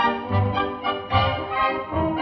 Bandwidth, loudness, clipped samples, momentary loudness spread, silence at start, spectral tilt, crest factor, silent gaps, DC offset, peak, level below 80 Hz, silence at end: 6 kHz; -23 LUFS; under 0.1%; 3 LU; 0 s; -8 dB/octave; 16 dB; none; under 0.1%; -6 dBFS; -42 dBFS; 0 s